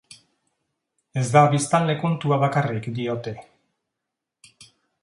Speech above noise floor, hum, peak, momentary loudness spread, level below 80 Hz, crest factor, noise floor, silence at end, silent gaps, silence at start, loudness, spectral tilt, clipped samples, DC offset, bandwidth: 63 dB; none; -2 dBFS; 14 LU; -64 dBFS; 22 dB; -84 dBFS; 1.6 s; none; 1.15 s; -22 LUFS; -6 dB/octave; under 0.1%; under 0.1%; 11.5 kHz